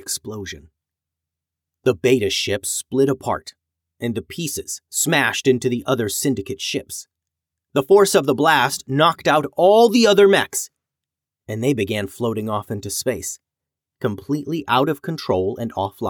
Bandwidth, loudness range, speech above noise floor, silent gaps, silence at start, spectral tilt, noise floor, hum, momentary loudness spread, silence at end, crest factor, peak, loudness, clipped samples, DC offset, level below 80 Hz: 19.5 kHz; 9 LU; 67 dB; none; 0.05 s; -4 dB/octave; -86 dBFS; none; 14 LU; 0 s; 16 dB; -4 dBFS; -19 LUFS; under 0.1%; under 0.1%; -58 dBFS